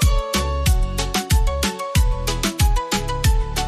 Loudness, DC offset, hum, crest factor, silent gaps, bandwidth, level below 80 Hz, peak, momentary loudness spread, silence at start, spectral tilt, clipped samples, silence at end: -21 LUFS; under 0.1%; none; 12 dB; none; 15.5 kHz; -20 dBFS; -6 dBFS; 3 LU; 0 s; -4 dB/octave; under 0.1%; 0 s